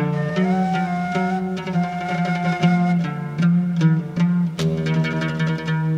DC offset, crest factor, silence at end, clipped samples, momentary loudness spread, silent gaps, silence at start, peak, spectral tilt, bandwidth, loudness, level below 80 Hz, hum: under 0.1%; 14 dB; 0 s; under 0.1%; 5 LU; none; 0 s; -6 dBFS; -7.5 dB/octave; 8 kHz; -21 LUFS; -54 dBFS; none